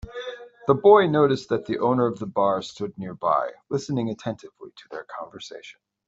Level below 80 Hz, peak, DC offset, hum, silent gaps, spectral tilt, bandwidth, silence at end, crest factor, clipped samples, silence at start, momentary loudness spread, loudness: -56 dBFS; -4 dBFS; under 0.1%; none; none; -6.5 dB/octave; 7.8 kHz; 0.35 s; 20 dB; under 0.1%; 0.05 s; 22 LU; -23 LUFS